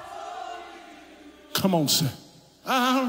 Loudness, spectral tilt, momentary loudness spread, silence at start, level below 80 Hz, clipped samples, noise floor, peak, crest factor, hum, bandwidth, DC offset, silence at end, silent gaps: -25 LUFS; -3.5 dB/octave; 23 LU; 0 s; -66 dBFS; under 0.1%; -49 dBFS; -8 dBFS; 20 dB; none; 16.5 kHz; under 0.1%; 0 s; none